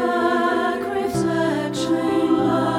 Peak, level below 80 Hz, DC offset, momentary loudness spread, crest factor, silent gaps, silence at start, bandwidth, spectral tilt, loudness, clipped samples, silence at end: -8 dBFS; -54 dBFS; under 0.1%; 4 LU; 12 dB; none; 0 s; 15 kHz; -5.5 dB/octave; -21 LUFS; under 0.1%; 0 s